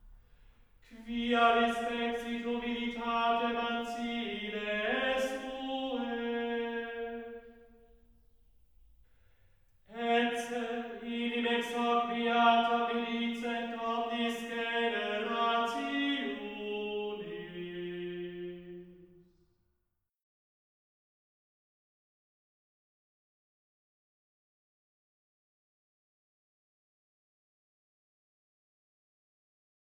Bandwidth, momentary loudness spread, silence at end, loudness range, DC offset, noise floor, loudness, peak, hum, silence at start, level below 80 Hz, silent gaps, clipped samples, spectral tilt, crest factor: over 20 kHz; 13 LU; 10.95 s; 13 LU; under 0.1%; -83 dBFS; -33 LUFS; -12 dBFS; none; 0.05 s; -66 dBFS; none; under 0.1%; -4 dB/octave; 24 dB